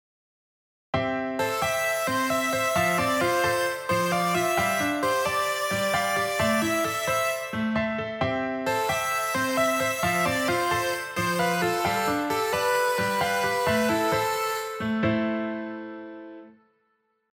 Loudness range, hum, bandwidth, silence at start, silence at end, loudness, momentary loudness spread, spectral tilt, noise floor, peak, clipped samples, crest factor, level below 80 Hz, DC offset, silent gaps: 2 LU; none; over 20 kHz; 0.95 s; 0.8 s; -25 LUFS; 5 LU; -3.5 dB/octave; -72 dBFS; -10 dBFS; under 0.1%; 16 dB; -56 dBFS; under 0.1%; none